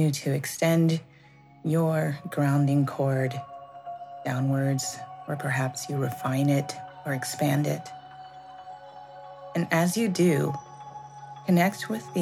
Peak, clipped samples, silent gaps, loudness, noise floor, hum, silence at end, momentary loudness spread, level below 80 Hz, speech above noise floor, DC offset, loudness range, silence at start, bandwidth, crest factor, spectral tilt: -8 dBFS; under 0.1%; none; -27 LUFS; -53 dBFS; none; 0 s; 20 LU; -72 dBFS; 28 dB; under 0.1%; 4 LU; 0 s; 15.5 kHz; 18 dB; -6 dB/octave